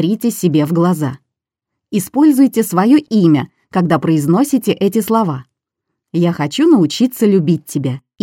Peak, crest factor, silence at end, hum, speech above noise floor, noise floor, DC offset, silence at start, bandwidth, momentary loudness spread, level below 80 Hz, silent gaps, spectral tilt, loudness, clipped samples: 0 dBFS; 14 dB; 0.25 s; none; 67 dB; -80 dBFS; under 0.1%; 0 s; 17 kHz; 9 LU; -60 dBFS; none; -6.5 dB/octave; -14 LUFS; under 0.1%